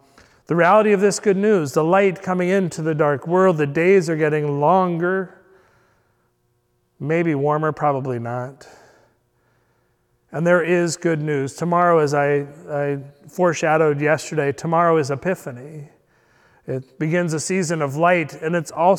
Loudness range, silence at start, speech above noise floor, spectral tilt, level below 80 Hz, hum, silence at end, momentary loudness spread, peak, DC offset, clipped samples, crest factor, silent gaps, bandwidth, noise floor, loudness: 6 LU; 0.5 s; 47 dB; -6 dB/octave; -66 dBFS; none; 0 s; 12 LU; -4 dBFS; under 0.1%; under 0.1%; 16 dB; none; 14.5 kHz; -66 dBFS; -19 LUFS